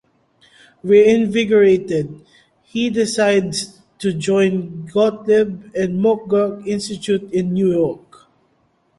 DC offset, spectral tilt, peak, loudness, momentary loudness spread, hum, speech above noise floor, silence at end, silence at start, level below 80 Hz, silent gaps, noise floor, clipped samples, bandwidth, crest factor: under 0.1%; -5.5 dB/octave; -2 dBFS; -17 LUFS; 11 LU; none; 45 dB; 1 s; 0.85 s; -56 dBFS; none; -61 dBFS; under 0.1%; 11.5 kHz; 16 dB